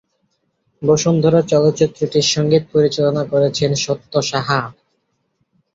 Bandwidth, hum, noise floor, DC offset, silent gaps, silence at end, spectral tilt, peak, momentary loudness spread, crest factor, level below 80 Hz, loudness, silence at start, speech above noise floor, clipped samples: 7.8 kHz; none; -68 dBFS; under 0.1%; none; 1.05 s; -5 dB/octave; -2 dBFS; 6 LU; 16 dB; -54 dBFS; -16 LUFS; 0.8 s; 52 dB; under 0.1%